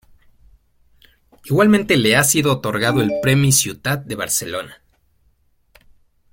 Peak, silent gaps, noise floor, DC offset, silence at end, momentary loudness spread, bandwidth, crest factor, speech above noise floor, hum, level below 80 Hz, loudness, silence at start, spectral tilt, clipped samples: -2 dBFS; none; -60 dBFS; under 0.1%; 1.6 s; 10 LU; 16.5 kHz; 18 dB; 43 dB; none; -50 dBFS; -16 LUFS; 1.45 s; -4 dB/octave; under 0.1%